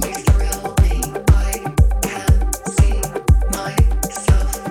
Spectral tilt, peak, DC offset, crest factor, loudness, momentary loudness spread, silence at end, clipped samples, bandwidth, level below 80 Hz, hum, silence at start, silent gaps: -5.5 dB/octave; 0 dBFS; under 0.1%; 14 dB; -18 LUFS; 4 LU; 0 s; under 0.1%; 18 kHz; -18 dBFS; none; 0 s; none